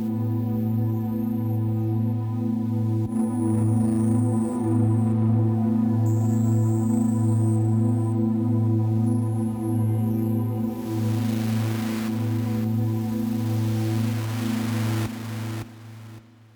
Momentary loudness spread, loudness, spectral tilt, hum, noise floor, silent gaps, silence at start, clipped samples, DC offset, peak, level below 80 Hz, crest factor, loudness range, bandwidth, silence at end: 5 LU; -24 LUFS; -8 dB/octave; none; -45 dBFS; none; 0 s; under 0.1%; under 0.1%; -12 dBFS; -56 dBFS; 12 dB; 4 LU; over 20 kHz; 0.35 s